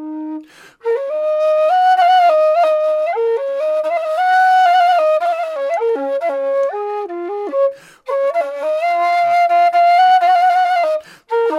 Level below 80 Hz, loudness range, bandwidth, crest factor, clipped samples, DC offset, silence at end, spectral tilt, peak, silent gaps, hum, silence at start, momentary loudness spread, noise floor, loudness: -74 dBFS; 5 LU; 11 kHz; 10 dB; under 0.1%; under 0.1%; 0 s; -2 dB/octave; -4 dBFS; none; none; 0 s; 12 LU; -35 dBFS; -15 LUFS